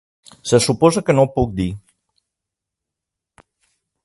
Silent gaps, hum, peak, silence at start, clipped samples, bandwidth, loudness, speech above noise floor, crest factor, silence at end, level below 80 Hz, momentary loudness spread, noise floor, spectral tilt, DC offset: none; none; 0 dBFS; 0.45 s; under 0.1%; 11.5 kHz; -17 LUFS; 68 dB; 20 dB; 2.25 s; -42 dBFS; 14 LU; -84 dBFS; -5.5 dB/octave; under 0.1%